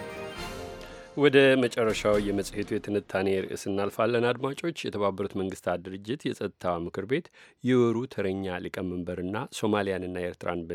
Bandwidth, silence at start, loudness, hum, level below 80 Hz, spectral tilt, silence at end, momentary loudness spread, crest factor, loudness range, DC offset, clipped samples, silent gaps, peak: 16 kHz; 0 s; -28 LUFS; none; -54 dBFS; -5.5 dB/octave; 0 s; 10 LU; 22 dB; 5 LU; under 0.1%; under 0.1%; none; -6 dBFS